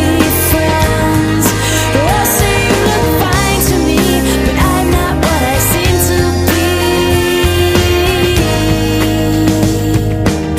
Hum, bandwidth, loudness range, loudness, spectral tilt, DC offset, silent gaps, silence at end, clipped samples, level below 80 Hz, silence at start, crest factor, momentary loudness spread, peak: none; 16 kHz; 0 LU; -11 LUFS; -4.5 dB/octave; under 0.1%; none; 0 s; under 0.1%; -20 dBFS; 0 s; 10 dB; 2 LU; 0 dBFS